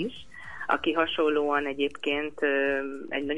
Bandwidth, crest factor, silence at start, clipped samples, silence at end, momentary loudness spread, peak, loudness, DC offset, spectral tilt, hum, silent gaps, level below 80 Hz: 10.5 kHz; 18 dB; 0 s; under 0.1%; 0 s; 11 LU; -10 dBFS; -27 LUFS; 0.5%; -5 dB/octave; none; none; -60 dBFS